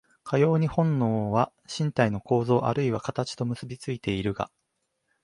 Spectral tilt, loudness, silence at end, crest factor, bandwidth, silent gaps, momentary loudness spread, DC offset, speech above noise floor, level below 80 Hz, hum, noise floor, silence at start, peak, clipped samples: -7 dB/octave; -27 LUFS; 0.8 s; 18 dB; 11.5 kHz; none; 9 LU; under 0.1%; 52 dB; -56 dBFS; none; -77 dBFS; 0.25 s; -8 dBFS; under 0.1%